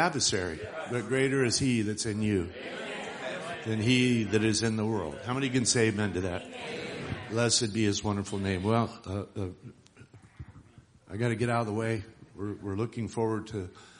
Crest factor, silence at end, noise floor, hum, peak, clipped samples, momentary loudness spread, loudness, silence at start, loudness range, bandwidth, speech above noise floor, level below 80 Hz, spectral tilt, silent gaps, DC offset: 20 dB; 0 s; -56 dBFS; none; -10 dBFS; under 0.1%; 13 LU; -30 LUFS; 0 s; 7 LU; 10.5 kHz; 27 dB; -58 dBFS; -4.5 dB/octave; none; under 0.1%